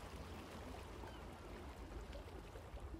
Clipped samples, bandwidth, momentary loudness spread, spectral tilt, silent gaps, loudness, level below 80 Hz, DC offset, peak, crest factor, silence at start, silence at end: under 0.1%; 16 kHz; 2 LU; -5.5 dB/octave; none; -54 LUFS; -56 dBFS; under 0.1%; -38 dBFS; 14 dB; 0 s; 0 s